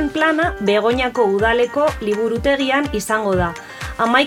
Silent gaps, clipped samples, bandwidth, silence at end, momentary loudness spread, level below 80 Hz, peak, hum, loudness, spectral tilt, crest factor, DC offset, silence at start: none; under 0.1%; 18.5 kHz; 0 s; 4 LU; -36 dBFS; -2 dBFS; none; -18 LUFS; -5 dB/octave; 16 dB; under 0.1%; 0 s